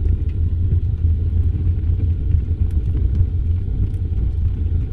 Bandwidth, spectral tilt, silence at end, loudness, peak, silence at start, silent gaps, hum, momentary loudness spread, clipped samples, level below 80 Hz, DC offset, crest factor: 2.6 kHz; -11 dB/octave; 0 s; -21 LUFS; -4 dBFS; 0 s; none; none; 3 LU; under 0.1%; -20 dBFS; under 0.1%; 14 dB